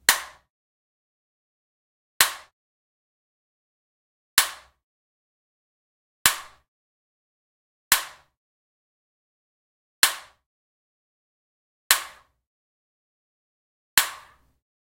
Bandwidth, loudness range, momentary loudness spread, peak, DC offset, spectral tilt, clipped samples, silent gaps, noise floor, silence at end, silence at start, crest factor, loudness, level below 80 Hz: 16.5 kHz; 3 LU; 18 LU; 0 dBFS; under 0.1%; 2 dB/octave; under 0.1%; 0.50-2.20 s, 2.53-4.37 s, 4.83-6.25 s, 6.68-7.91 s, 8.37-10.02 s, 10.46-11.90 s, 12.47-13.97 s; -50 dBFS; 0.65 s; 0.1 s; 32 dB; -22 LUFS; -60 dBFS